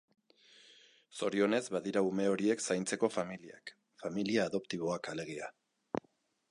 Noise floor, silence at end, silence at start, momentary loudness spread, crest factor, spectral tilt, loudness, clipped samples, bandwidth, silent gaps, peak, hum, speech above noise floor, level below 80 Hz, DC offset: -74 dBFS; 0.5 s; 1.15 s; 15 LU; 20 dB; -4.5 dB/octave; -35 LUFS; under 0.1%; 11.5 kHz; none; -16 dBFS; none; 39 dB; -76 dBFS; under 0.1%